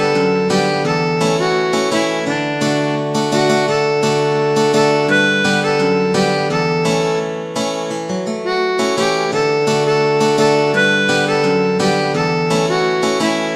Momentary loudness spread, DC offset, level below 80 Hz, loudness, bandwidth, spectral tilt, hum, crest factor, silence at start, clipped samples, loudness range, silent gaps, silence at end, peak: 5 LU; under 0.1%; -56 dBFS; -15 LUFS; 13.5 kHz; -4.5 dB/octave; none; 14 dB; 0 s; under 0.1%; 3 LU; none; 0 s; -2 dBFS